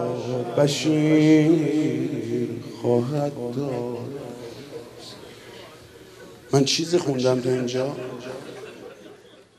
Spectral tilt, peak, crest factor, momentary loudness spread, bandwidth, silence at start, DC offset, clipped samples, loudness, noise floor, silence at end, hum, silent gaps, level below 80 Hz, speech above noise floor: -5.5 dB/octave; -4 dBFS; 20 dB; 23 LU; 13.5 kHz; 0 s; under 0.1%; under 0.1%; -22 LUFS; -48 dBFS; 0.45 s; none; none; -64 dBFS; 27 dB